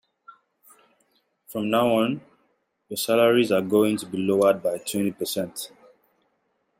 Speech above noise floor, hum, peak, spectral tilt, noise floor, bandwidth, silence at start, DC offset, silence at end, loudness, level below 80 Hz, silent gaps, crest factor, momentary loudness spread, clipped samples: 49 dB; none; -6 dBFS; -4.5 dB/octave; -72 dBFS; 16 kHz; 1.5 s; under 0.1%; 1.15 s; -23 LUFS; -68 dBFS; none; 18 dB; 15 LU; under 0.1%